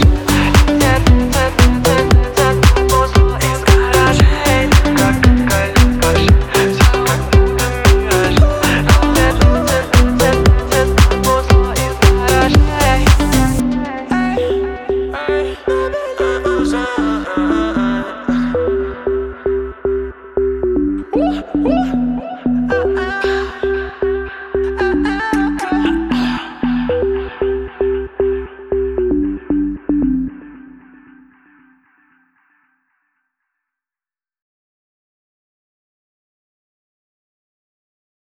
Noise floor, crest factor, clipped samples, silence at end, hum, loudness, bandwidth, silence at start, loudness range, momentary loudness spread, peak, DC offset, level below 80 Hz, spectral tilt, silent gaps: under -90 dBFS; 14 dB; under 0.1%; 7.55 s; none; -14 LUFS; over 20 kHz; 0 s; 7 LU; 8 LU; 0 dBFS; under 0.1%; -20 dBFS; -5.5 dB/octave; none